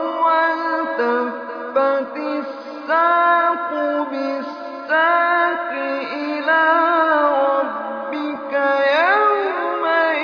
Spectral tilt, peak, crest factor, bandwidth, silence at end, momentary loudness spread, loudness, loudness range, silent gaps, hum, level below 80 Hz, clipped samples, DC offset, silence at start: -4.5 dB/octave; -2 dBFS; 16 dB; 5.4 kHz; 0 s; 10 LU; -18 LUFS; 2 LU; none; none; -74 dBFS; under 0.1%; under 0.1%; 0 s